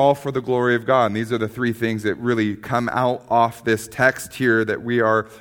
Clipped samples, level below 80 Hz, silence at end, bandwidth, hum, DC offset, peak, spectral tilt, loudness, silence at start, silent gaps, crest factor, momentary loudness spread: under 0.1%; -56 dBFS; 0 s; 19 kHz; none; under 0.1%; -2 dBFS; -6 dB/octave; -20 LUFS; 0 s; none; 18 dB; 5 LU